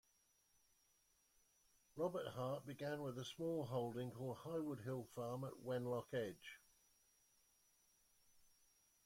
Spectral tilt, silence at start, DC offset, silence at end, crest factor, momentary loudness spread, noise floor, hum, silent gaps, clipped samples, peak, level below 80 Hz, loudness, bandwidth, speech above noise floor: -6.5 dB/octave; 1.95 s; under 0.1%; 0.6 s; 18 dB; 6 LU; -80 dBFS; none; none; under 0.1%; -32 dBFS; -82 dBFS; -47 LUFS; 16.5 kHz; 33 dB